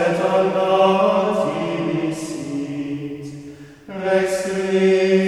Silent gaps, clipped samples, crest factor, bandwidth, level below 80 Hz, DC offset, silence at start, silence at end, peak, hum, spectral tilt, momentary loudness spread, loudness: none; under 0.1%; 16 dB; 12.5 kHz; -58 dBFS; under 0.1%; 0 s; 0 s; -4 dBFS; none; -6 dB/octave; 16 LU; -19 LUFS